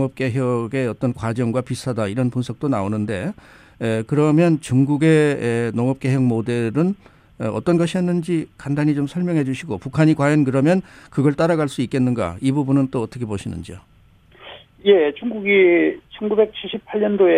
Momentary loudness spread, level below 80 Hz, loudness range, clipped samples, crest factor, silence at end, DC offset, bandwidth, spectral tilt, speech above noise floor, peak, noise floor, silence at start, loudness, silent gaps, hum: 11 LU; -52 dBFS; 4 LU; under 0.1%; 16 dB; 0 s; under 0.1%; 12.5 kHz; -7.5 dB/octave; 32 dB; -4 dBFS; -51 dBFS; 0 s; -20 LUFS; none; none